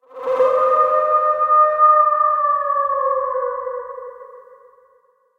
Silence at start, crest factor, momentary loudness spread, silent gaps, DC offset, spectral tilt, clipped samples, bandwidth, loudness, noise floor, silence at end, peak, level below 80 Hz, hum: 0.15 s; 14 dB; 16 LU; none; under 0.1%; -4.5 dB/octave; under 0.1%; 4.4 kHz; -16 LUFS; -58 dBFS; 0.95 s; -4 dBFS; -64 dBFS; none